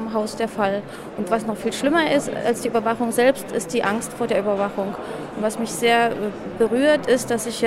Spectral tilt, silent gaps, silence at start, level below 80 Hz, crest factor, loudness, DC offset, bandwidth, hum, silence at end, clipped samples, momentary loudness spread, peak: -4 dB/octave; none; 0 s; -54 dBFS; 18 dB; -22 LUFS; under 0.1%; 16 kHz; none; 0 s; under 0.1%; 10 LU; -4 dBFS